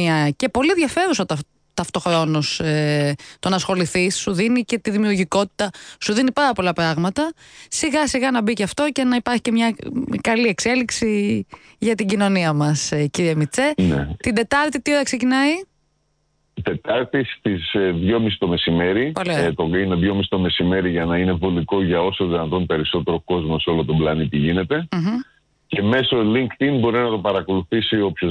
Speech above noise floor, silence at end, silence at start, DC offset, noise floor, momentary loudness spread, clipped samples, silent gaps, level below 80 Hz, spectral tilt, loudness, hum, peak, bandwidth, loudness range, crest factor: 47 dB; 0 s; 0 s; under 0.1%; -66 dBFS; 5 LU; under 0.1%; none; -44 dBFS; -5 dB/octave; -20 LUFS; none; -8 dBFS; 10.5 kHz; 2 LU; 12 dB